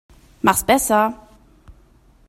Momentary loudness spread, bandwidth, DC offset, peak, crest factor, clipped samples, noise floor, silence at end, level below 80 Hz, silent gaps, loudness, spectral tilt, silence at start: 8 LU; 16 kHz; under 0.1%; 0 dBFS; 22 dB; under 0.1%; -52 dBFS; 0.6 s; -46 dBFS; none; -18 LUFS; -3 dB/octave; 0.45 s